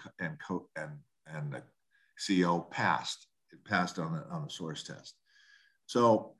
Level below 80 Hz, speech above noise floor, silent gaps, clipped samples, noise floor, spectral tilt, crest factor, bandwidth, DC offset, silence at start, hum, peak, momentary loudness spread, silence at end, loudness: -72 dBFS; 39 dB; none; under 0.1%; -71 dBFS; -5 dB/octave; 22 dB; 12 kHz; under 0.1%; 0 s; none; -14 dBFS; 17 LU; 0.1 s; -34 LUFS